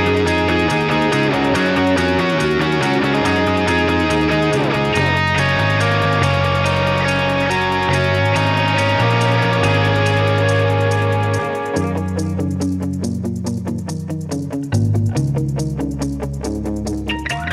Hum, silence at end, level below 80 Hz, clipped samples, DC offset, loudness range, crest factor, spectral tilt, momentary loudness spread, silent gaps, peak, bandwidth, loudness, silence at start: none; 0 s; -36 dBFS; under 0.1%; under 0.1%; 6 LU; 14 dB; -6 dB/octave; 8 LU; none; -4 dBFS; 13.5 kHz; -17 LUFS; 0 s